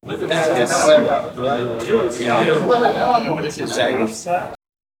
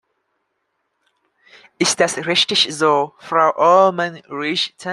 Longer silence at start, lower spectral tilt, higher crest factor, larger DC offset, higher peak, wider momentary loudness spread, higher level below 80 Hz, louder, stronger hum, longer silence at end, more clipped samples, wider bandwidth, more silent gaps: second, 0.05 s vs 1.8 s; first, -4 dB/octave vs -2.5 dB/octave; about the same, 18 dB vs 16 dB; neither; about the same, 0 dBFS vs -2 dBFS; about the same, 9 LU vs 9 LU; first, -54 dBFS vs -68 dBFS; about the same, -18 LUFS vs -16 LUFS; neither; first, 0.45 s vs 0 s; neither; first, 16.5 kHz vs 12.5 kHz; neither